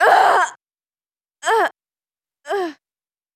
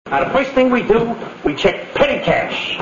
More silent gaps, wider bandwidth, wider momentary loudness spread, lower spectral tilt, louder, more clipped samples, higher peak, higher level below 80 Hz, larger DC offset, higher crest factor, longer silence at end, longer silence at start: neither; first, 14.5 kHz vs 7.4 kHz; first, 13 LU vs 7 LU; second, -1 dB/octave vs -5.5 dB/octave; about the same, -18 LUFS vs -16 LUFS; neither; about the same, 0 dBFS vs 0 dBFS; second, -82 dBFS vs -40 dBFS; neither; about the same, 20 dB vs 16 dB; first, 0.65 s vs 0 s; about the same, 0 s vs 0.05 s